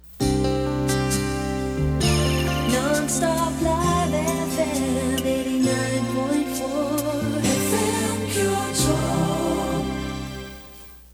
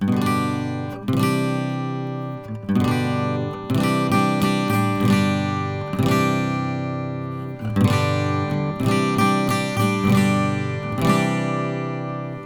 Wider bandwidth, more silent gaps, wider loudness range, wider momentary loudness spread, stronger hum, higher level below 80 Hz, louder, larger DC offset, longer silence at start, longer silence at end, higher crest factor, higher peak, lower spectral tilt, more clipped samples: about the same, over 20 kHz vs 20 kHz; neither; about the same, 1 LU vs 3 LU; second, 5 LU vs 9 LU; neither; first, -36 dBFS vs -50 dBFS; about the same, -23 LUFS vs -21 LUFS; second, under 0.1% vs 0.1%; about the same, 0.05 s vs 0 s; about the same, 0.05 s vs 0 s; about the same, 16 dB vs 16 dB; second, -8 dBFS vs -4 dBFS; second, -4.5 dB/octave vs -6.5 dB/octave; neither